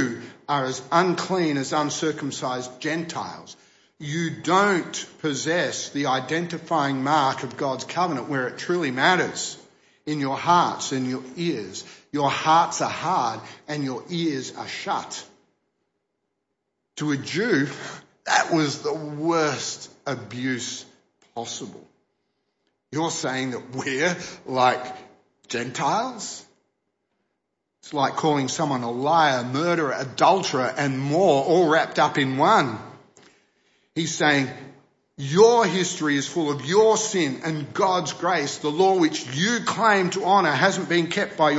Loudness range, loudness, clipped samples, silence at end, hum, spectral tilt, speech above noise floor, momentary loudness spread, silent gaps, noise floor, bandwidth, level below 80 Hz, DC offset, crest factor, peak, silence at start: 8 LU; -23 LUFS; under 0.1%; 0 s; none; -4 dB/octave; 55 dB; 13 LU; none; -78 dBFS; 8 kHz; -70 dBFS; under 0.1%; 20 dB; -2 dBFS; 0 s